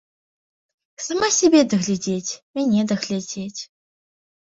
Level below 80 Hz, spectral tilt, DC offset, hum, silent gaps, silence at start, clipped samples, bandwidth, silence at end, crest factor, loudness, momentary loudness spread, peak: -62 dBFS; -4 dB/octave; under 0.1%; none; 2.42-2.54 s; 1 s; under 0.1%; 7.8 kHz; 0.75 s; 18 dB; -20 LUFS; 17 LU; -4 dBFS